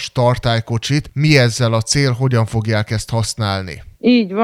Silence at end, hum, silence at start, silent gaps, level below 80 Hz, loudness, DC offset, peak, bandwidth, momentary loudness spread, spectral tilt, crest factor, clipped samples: 0 s; none; 0 s; none; -40 dBFS; -16 LUFS; under 0.1%; 0 dBFS; 13.5 kHz; 8 LU; -5.5 dB/octave; 16 dB; under 0.1%